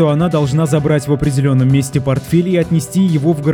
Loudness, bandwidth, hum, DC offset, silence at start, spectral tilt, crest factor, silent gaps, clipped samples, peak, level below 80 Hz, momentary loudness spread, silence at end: -14 LUFS; 17 kHz; none; under 0.1%; 0 s; -7 dB/octave; 12 dB; none; under 0.1%; 0 dBFS; -38 dBFS; 3 LU; 0 s